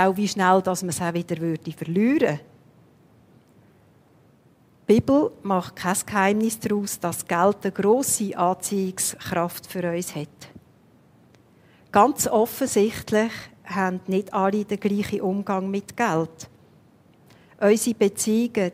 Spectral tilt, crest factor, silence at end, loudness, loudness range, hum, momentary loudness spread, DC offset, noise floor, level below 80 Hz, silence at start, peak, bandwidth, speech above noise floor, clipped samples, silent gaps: -5 dB/octave; 20 dB; 0 s; -23 LUFS; 5 LU; none; 9 LU; under 0.1%; -57 dBFS; -60 dBFS; 0 s; -4 dBFS; 16 kHz; 34 dB; under 0.1%; none